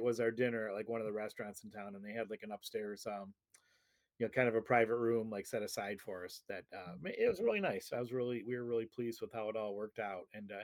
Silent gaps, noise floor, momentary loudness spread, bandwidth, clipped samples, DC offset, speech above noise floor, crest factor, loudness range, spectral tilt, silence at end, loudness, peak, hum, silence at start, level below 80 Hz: none; -77 dBFS; 14 LU; 18 kHz; under 0.1%; under 0.1%; 39 dB; 22 dB; 7 LU; -5.5 dB/octave; 0 s; -39 LUFS; -18 dBFS; none; 0 s; -78 dBFS